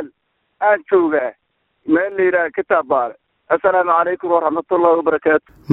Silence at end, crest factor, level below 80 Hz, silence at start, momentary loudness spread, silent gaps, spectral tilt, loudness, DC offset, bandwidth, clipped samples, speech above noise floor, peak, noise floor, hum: 0 s; 18 dB; -60 dBFS; 0 s; 6 LU; none; -10 dB/octave; -17 LUFS; under 0.1%; 4 kHz; under 0.1%; 50 dB; 0 dBFS; -66 dBFS; none